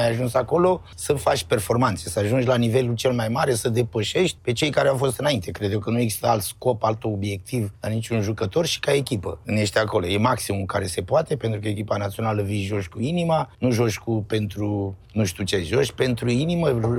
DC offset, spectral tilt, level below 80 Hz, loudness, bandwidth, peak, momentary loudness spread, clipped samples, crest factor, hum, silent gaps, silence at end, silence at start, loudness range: under 0.1%; -5.5 dB/octave; -48 dBFS; -23 LUFS; 17 kHz; -6 dBFS; 6 LU; under 0.1%; 16 dB; none; none; 0 s; 0 s; 3 LU